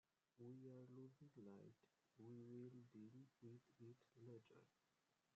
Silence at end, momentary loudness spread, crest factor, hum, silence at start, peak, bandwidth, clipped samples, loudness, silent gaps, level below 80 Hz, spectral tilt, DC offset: 0.65 s; 7 LU; 14 dB; none; 0.35 s; -50 dBFS; 7.4 kHz; under 0.1%; -64 LUFS; none; under -90 dBFS; -9 dB/octave; under 0.1%